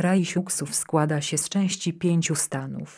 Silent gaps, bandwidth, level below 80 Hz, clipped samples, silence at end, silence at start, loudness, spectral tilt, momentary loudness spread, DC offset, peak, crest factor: none; 14 kHz; -68 dBFS; under 0.1%; 0 s; 0 s; -25 LUFS; -4.5 dB/octave; 3 LU; under 0.1%; -6 dBFS; 18 dB